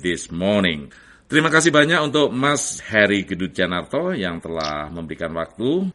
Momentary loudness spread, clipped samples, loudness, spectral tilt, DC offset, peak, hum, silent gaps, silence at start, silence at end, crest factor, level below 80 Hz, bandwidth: 12 LU; under 0.1%; -20 LUFS; -4 dB/octave; under 0.1%; 0 dBFS; none; none; 0 s; 0.05 s; 20 dB; -50 dBFS; 11.5 kHz